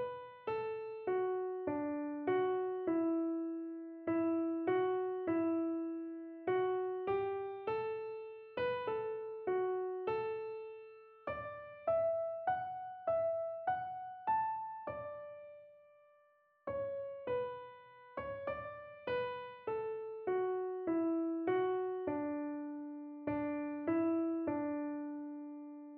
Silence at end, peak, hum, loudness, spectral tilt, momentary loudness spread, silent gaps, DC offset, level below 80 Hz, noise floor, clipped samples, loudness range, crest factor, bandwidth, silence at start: 0 s; -22 dBFS; none; -39 LUFS; -5 dB/octave; 12 LU; none; under 0.1%; -74 dBFS; -71 dBFS; under 0.1%; 6 LU; 16 dB; 4.8 kHz; 0 s